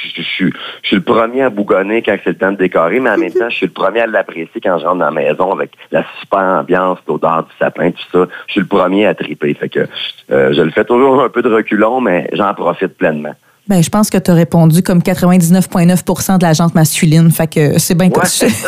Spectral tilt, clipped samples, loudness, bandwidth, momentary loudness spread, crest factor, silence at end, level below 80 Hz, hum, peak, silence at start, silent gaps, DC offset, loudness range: -5.5 dB/octave; under 0.1%; -12 LUFS; 16 kHz; 8 LU; 12 dB; 0 s; -46 dBFS; none; 0 dBFS; 0 s; none; under 0.1%; 4 LU